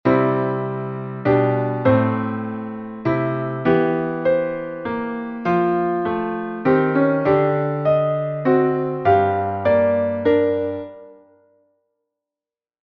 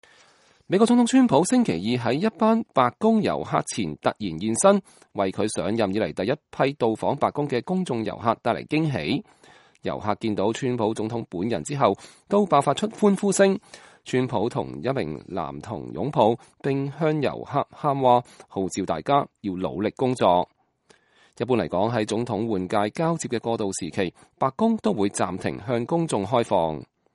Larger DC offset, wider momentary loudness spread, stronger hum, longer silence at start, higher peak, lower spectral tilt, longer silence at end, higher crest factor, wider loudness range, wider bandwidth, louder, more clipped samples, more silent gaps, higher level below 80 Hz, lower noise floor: neither; about the same, 9 LU vs 10 LU; neither; second, 0.05 s vs 0.7 s; about the same, -4 dBFS vs -2 dBFS; first, -10 dB/octave vs -5.5 dB/octave; first, 1.8 s vs 0.3 s; about the same, 16 dB vs 20 dB; about the same, 4 LU vs 4 LU; second, 5.8 kHz vs 11.5 kHz; first, -20 LUFS vs -24 LUFS; neither; neither; about the same, -54 dBFS vs -58 dBFS; first, under -90 dBFS vs -61 dBFS